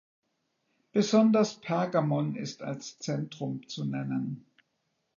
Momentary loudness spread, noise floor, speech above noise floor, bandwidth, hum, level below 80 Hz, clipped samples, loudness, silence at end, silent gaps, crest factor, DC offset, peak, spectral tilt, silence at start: 14 LU; -78 dBFS; 50 dB; 7.4 kHz; none; -78 dBFS; under 0.1%; -30 LUFS; 0.8 s; none; 18 dB; under 0.1%; -12 dBFS; -6 dB/octave; 0.95 s